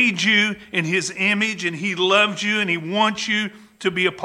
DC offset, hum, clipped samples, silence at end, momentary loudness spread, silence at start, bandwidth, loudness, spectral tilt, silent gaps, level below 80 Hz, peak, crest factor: under 0.1%; none; under 0.1%; 0 s; 7 LU; 0 s; 12.5 kHz; -19 LUFS; -3.5 dB/octave; none; -64 dBFS; -2 dBFS; 18 dB